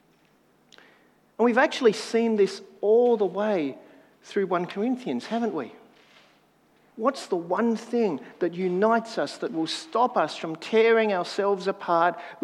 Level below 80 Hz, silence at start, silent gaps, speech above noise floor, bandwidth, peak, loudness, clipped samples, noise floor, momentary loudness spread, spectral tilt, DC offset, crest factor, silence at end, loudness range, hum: -84 dBFS; 1.4 s; none; 38 dB; 11.5 kHz; -8 dBFS; -25 LUFS; under 0.1%; -62 dBFS; 9 LU; -5 dB/octave; under 0.1%; 18 dB; 0.1 s; 6 LU; none